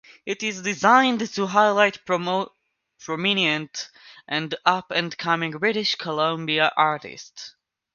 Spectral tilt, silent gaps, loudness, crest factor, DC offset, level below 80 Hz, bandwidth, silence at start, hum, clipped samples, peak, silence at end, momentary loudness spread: -3.5 dB/octave; none; -22 LUFS; 22 dB; under 0.1%; -70 dBFS; 7.4 kHz; 0.25 s; none; under 0.1%; -2 dBFS; 0.45 s; 18 LU